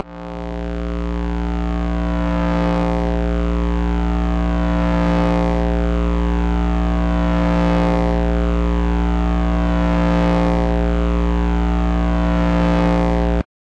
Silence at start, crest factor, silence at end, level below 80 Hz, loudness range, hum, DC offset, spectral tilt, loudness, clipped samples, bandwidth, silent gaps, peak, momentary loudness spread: 0 s; 8 dB; 0.2 s; -20 dBFS; 2 LU; none; 0.4%; -8 dB/octave; -19 LUFS; under 0.1%; 7.6 kHz; none; -8 dBFS; 6 LU